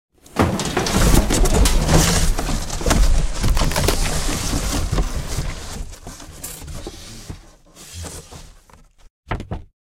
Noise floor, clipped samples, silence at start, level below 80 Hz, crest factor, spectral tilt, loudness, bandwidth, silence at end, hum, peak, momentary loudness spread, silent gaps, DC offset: -48 dBFS; under 0.1%; 0.35 s; -22 dBFS; 18 dB; -4 dB/octave; -20 LUFS; 16.5 kHz; 0.25 s; none; 0 dBFS; 20 LU; 9.10-9.23 s; under 0.1%